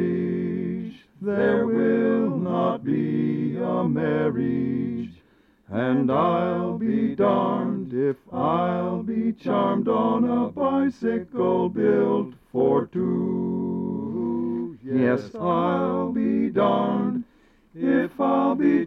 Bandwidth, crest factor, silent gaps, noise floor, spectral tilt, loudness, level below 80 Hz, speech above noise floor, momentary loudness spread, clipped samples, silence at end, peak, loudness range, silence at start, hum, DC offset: 5.8 kHz; 14 dB; none; -59 dBFS; -9.5 dB/octave; -24 LUFS; -62 dBFS; 36 dB; 7 LU; under 0.1%; 0 s; -10 dBFS; 2 LU; 0 s; none; under 0.1%